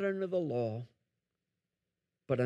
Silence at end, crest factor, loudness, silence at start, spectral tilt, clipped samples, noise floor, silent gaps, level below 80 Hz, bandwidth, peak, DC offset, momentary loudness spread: 0 s; 18 dB; -36 LUFS; 0 s; -9 dB/octave; under 0.1%; -88 dBFS; none; -78 dBFS; 7.4 kHz; -18 dBFS; under 0.1%; 12 LU